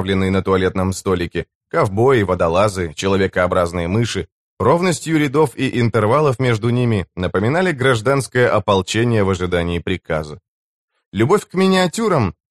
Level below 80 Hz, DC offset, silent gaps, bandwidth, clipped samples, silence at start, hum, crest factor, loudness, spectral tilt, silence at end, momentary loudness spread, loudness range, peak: -42 dBFS; 0.2%; 1.55-1.61 s, 4.32-4.57 s, 10.48-10.88 s, 11.06-11.12 s; 13 kHz; under 0.1%; 0 s; none; 14 dB; -17 LUFS; -6 dB/octave; 0.2 s; 7 LU; 2 LU; -2 dBFS